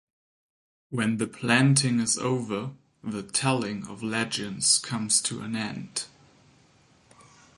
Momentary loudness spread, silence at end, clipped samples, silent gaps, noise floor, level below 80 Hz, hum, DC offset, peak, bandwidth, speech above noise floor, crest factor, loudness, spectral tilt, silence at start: 13 LU; 1.5 s; under 0.1%; none; -60 dBFS; -66 dBFS; none; under 0.1%; -8 dBFS; 11.5 kHz; 34 dB; 20 dB; -26 LUFS; -3.5 dB/octave; 0.9 s